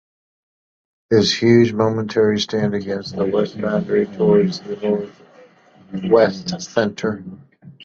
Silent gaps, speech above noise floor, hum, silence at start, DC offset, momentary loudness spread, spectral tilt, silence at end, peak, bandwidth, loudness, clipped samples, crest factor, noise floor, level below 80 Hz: none; 31 dB; none; 1.1 s; under 0.1%; 12 LU; -6 dB/octave; 0 s; -2 dBFS; 7.6 kHz; -18 LUFS; under 0.1%; 18 dB; -48 dBFS; -54 dBFS